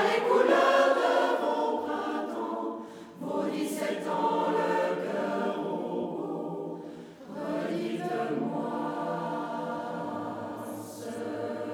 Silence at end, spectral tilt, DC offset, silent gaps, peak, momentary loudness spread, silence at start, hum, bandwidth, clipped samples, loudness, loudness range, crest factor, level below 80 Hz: 0 s; -5 dB/octave; under 0.1%; none; -10 dBFS; 15 LU; 0 s; none; 19 kHz; under 0.1%; -30 LUFS; 6 LU; 18 dB; -78 dBFS